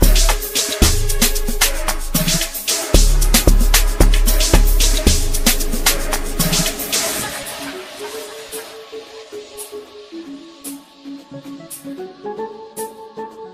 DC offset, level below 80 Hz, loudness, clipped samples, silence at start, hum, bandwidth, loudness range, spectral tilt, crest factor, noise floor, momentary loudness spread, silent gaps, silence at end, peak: under 0.1%; -18 dBFS; -17 LUFS; under 0.1%; 0 s; none; 16 kHz; 17 LU; -3 dB/octave; 16 dB; -36 dBFS; 19 LU; none; 0 s; 0 dBFS